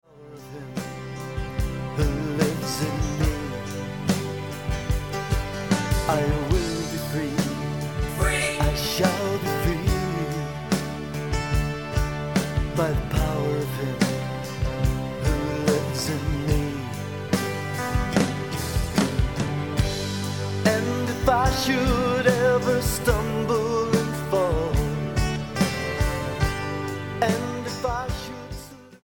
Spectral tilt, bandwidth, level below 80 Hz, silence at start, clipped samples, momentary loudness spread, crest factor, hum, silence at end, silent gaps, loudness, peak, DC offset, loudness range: -5.5 dB/octave; 17.5 kHz; -32 dBFS; 0.1 s; under 0.1%; 9 LU; 20 dB; none; 0.05 s; none; -25 LUFS; -4 dBFS; 0.3%; 5 LU